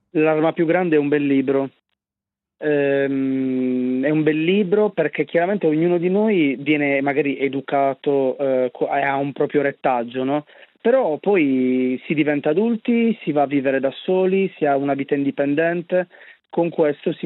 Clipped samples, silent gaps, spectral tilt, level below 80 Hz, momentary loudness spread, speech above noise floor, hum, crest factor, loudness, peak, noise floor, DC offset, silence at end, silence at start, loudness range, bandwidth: under 0.1%; none; -10.5 dB/octave; -76 dBFS; 4 LU; 69 dB; none; 14 dB; -20 LUFS; -6 dBFS; -88 dBFS; under 0.1%; 0 s; 0.15 s; 2 LU; 4.1 kHz